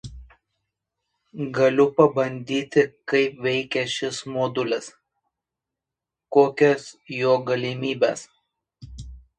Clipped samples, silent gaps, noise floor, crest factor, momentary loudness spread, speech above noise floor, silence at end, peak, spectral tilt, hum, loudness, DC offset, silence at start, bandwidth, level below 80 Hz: under 0.1%; none; -87 dBFS; 22 dB; 17 LU; 65 dB; 0.2 s; -2 dBFS; -5 dB/octave; none; -22 LUFS; under 0.1%; 0.05 s; 9.8 kHz; -52 dBFS